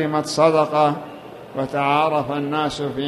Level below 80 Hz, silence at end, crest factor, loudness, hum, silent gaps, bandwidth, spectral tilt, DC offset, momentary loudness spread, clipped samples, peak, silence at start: -56 dBFS; 0 s; 18 dB; -20 LUFS; none; none; 14 kHz; -5.5 dB/octave; under 0.1%; 15 LU; under 0.1%; -2 dBFS; 0 s